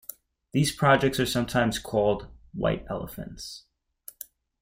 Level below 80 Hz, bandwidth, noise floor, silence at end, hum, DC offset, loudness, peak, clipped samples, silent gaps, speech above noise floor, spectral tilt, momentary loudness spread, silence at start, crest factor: -48 dBFS; 16.5 kHz; -51 dBFS; 1.05 s; none; under 0.1%; -26 LUFS; -6 dBFS; under 0.1%; none; 26 dB; -5 dB/octave; 23 LU; 0.55 s; 22 dB